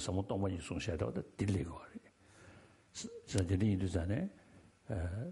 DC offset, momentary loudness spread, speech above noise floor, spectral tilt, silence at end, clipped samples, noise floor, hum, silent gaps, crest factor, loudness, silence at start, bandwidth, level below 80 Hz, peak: under 0.1%; 20 LU; 24 dB; -6.5 dB/octave; 0 s; under 0.1%; -61 dBFS; none; none; 22 dB; -38 LUFS; 0 s; 11.5 kHz; -54 dBFS; -16 dBFS